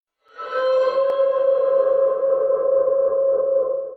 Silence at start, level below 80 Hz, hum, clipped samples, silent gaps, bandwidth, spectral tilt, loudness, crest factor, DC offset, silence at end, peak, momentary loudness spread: 0.35 s; -66 dBFS; none; under 0.1%; none; 4.6 kHz; -4.5 dB/octave; -19 LUFS; 10 dB; under 0.1%; 0 s; -8 dBFS; 3 LU